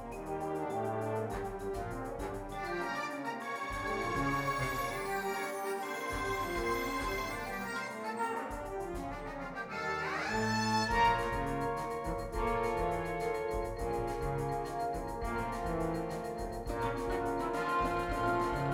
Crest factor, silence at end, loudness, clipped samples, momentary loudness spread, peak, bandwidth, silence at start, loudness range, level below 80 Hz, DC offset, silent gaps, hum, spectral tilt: 18 dB; 0 s; -36 LUFS; under 0.1%; 7 LU; -18 dBFS; over 20 kHz; 0 s; 5 LU; -48 dBFS; under 0.1%; none; none; -5 dB/octave